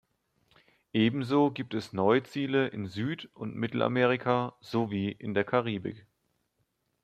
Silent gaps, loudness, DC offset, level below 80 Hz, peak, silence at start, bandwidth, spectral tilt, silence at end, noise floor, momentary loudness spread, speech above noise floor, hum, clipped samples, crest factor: none; -30 LUFS; under 0.1%; -70 dBFS; -10 dBFS; 0.95 s; 13 kHz; -7.5 dB/octave; 1.05 s; -77 dBFS; 9 LU; 48 dB; none; under 0.1%; 20 dB